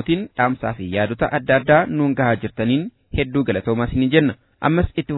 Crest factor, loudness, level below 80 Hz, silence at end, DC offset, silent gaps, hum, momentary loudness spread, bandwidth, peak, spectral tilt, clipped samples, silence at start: 18 dB; -19 LUFS; -38 dBFS; 0 s; under 0.1%; none; none; 7 LU; 4.1 kHz; 0 dBFS; -10.5 dB/octave; under 0.1%; 0 s